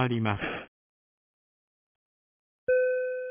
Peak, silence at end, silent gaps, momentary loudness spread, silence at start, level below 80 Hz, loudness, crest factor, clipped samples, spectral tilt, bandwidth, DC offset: -12 dBFS; 0 s; 0.68-2.67 s; 11 LU; 0 s; -60 dBFS; -29 LUFS; 20 dB; under 0.1%; -10 dB/octave; 3.6 kHz; under 0.1%